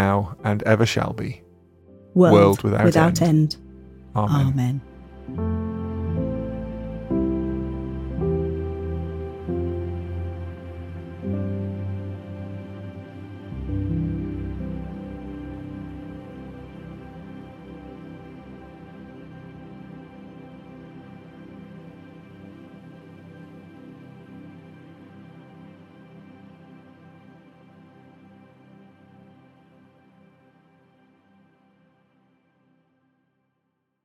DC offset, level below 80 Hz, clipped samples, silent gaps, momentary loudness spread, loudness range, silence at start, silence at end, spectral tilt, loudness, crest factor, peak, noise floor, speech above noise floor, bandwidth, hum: under 0.1%; -44 dBFS; under 0.1%; none; 26 LU; 25 LU; 0 s; 6.95 s; -7 dB/octave; -24 LUFS; 26 dB; 0 dBFS; -75 dBFS; 57 dB; 16 kHz; none